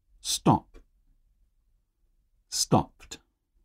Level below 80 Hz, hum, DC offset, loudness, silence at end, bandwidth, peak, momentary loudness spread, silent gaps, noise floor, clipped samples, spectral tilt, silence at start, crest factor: -54 dBFS; none; under 0.1%; -26 LUFS; 0.5 s; 16 kHz; -8 dBFS; 21 LU; none; -70 dBFS; under 0.1%; -4.5 dB/octave; 0.25 s; 24 dB